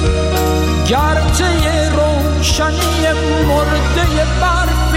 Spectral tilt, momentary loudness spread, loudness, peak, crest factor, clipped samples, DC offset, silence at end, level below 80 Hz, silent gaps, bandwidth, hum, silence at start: -5 dB/octave; 1 LU; -14 LUFS; -4 dBFS; 8 dB; under 0.1%; under 0.1%; 0 s; -18 dBFS; none; 16.5 kHz; none; 0 s